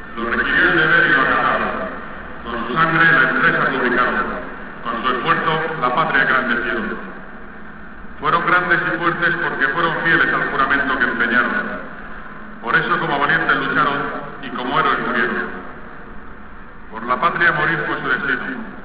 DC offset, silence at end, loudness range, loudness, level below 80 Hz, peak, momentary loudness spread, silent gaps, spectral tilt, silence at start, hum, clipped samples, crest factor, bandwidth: 2%; 0 s; 5 LU; -17 LUFS; -44 dBFS; -4 dBFS; 20 LU; none; -8 dB/octave; 0 s; none; under 0.1%; 16 dB; 4 kHz